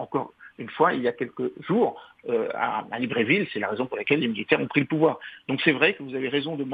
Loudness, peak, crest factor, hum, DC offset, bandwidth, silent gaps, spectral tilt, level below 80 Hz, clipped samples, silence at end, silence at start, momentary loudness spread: -25 LUFS; -4 dBFS; 22 dB; none; under 0.1%; 4.9 kHz; none; -8.5 dB/octave; -70 dBFS; under 0.1%; 0 s; 0 s; 9 LU